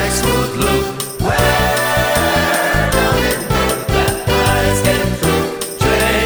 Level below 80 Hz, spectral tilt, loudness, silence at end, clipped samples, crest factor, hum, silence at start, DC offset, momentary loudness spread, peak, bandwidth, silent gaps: -26 dBFS; -4 dB/octave; -15 LUFS; 0 s; under 0.1%; 14 dB; none; 0 s; under 0.1%; 4 LU; 0 dBFS; over 20 kHz; none